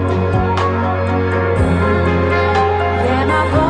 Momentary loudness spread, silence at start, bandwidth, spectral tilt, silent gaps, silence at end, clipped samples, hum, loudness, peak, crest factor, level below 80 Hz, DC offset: 2 LU; 0 s; 9.8 kHz; -7.5 dB/octave; none; 0 s; under 0.1%; none; -15 LUFS; -2 dBFS; 12 dB; -28 dBFS; under 0.1%